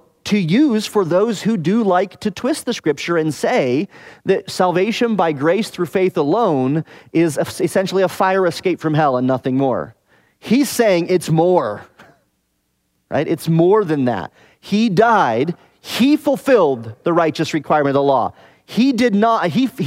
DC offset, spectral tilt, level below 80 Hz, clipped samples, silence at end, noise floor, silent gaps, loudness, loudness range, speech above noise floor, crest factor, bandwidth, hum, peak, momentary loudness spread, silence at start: under 0.1%; -6 dB/octave; -60 dBFS; under 0.1%; 0 s; -67 dBFS; none; -17 LUFS; 2 LU; 51 dB; 16 dB; 16 kHz; none; -2 dBFS; 8 LU; 0.25 s